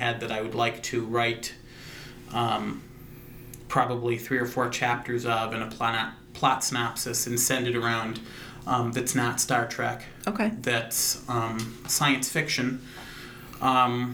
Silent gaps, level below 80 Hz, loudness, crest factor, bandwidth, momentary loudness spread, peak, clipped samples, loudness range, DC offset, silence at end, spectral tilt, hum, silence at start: none; -54 dBFS; -27 LUFS; 20 dB; over 20 kHz; 18 LU; -8 dBFS; under 0.1%; 4 LU; under 0.1%; 0 s; -3.5 dB/octave; none; 0 s